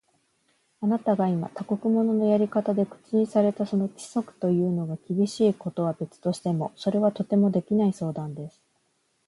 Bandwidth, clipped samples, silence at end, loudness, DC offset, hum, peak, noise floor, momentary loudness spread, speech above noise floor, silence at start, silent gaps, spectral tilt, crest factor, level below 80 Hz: 11.5 kHz; under 0.1%; 0.8 s; -26 LUFS; under 0.1%; none; -10 dBFS; -71 dBFS; 8 LU; 46 dB; 0.8 s; none; -8 dB/octave; 16 dB; -70 dBFS